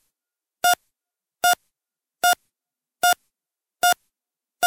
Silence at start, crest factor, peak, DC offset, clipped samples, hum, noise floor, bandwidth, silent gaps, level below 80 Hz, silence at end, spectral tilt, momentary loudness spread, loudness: 0.65 s; 20 dB; -4 dBFS; under 0.1%; under 0.1%; none; -88 dBFS; 17 kHz; none; -74 dBFS; 0 s; 1 dB/octave; 5 LU; -22 LUFS